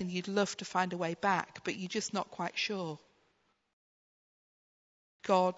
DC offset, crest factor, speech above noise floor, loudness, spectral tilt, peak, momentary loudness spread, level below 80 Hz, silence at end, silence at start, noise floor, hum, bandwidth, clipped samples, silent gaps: under 0.1%; 22 dB; 41 dB; -34 LUFS; -3.5 dB/octave; -14 dBFS; 8 LU; -78 dBFS; 0 s; 0 s; -75 dBFS; none; 7.6 kHz; under 0.1%; 3.73-5.19 s